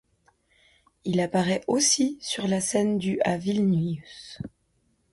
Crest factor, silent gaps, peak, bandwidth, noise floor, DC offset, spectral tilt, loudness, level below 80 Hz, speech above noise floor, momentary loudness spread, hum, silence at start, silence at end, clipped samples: 16 dB; none; -10 dBFS; 11.5 kHz; -69 dBFS; under 0.1%; -4 dB/octave; -25 LUFS; -60 dBFS; 44 dB; 18 LU; none; 1.05 s; 0.65 s; under 0.1%